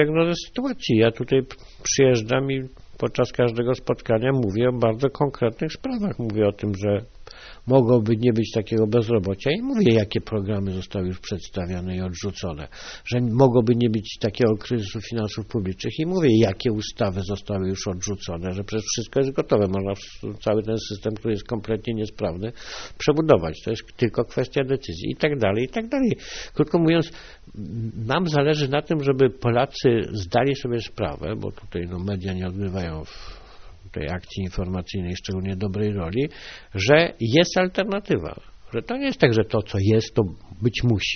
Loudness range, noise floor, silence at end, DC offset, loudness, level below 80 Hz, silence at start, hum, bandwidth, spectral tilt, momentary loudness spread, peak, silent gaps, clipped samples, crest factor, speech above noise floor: 6 LU; -42 dBFS; 0 s; under 0.1%; -23 LUFS; -46 dBFS; 0 s; none; 6.6 kHz; -5.5 dB/octave; 12 LU; 0 dBFS; none; under 0.1%; 22 dB; 20 dB